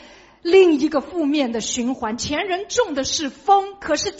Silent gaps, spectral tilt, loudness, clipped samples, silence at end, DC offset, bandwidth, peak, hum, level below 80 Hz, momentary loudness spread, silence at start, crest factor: none; -2 dB/octave; -20 LUFS; under 0.1%; 0 s; under 0.1%; 8 kHz; -2 dBFS; none; -50 dBFS; 9 LU; 0.45 s; 18 dB